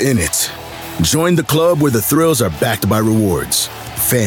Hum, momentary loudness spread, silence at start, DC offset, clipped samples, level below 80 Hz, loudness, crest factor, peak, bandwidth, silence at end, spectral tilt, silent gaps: none; 6 LU; 0 s; under 0.1%; under 0.1%; -40 dBFS; -14 LUFS; 12 dB; -4 dBFS; 17.5 kHz; 0 s; -4.5 dB/octave; none